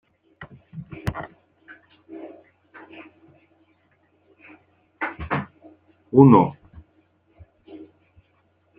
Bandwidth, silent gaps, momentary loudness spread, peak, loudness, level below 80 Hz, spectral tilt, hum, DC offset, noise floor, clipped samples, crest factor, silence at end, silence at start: 5.8 kHz; none; 31 LU; -2 dBFS; -20 LUFS; -54 dBFS; -10 dB/octave; none; under 0.1%; -64 dBFS; under 0.1%; 24 dB; 0.95 s; 0.4 s